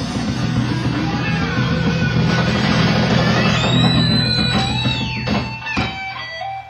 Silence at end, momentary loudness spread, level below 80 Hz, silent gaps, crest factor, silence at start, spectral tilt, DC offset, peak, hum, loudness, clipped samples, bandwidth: 0 s; 7 LU; -34 dBFS; none; 14 dB; 0 s; -5.5 dB/octave; under 0.1%; -2 dBFS; none; -17 LUFS; under 0.1%; 10 kHz